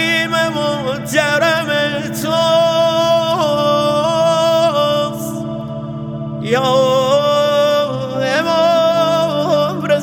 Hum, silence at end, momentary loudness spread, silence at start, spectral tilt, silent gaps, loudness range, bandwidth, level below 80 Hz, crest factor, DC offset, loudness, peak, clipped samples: none; 0 s; 10 LU; 0 s; -4.5 dB/octave; none; 2 LU; 19 kHz; -50 dBFS; 14 dB; under 0.1%; -15 LUFS; 0 dBFS; under 0.1%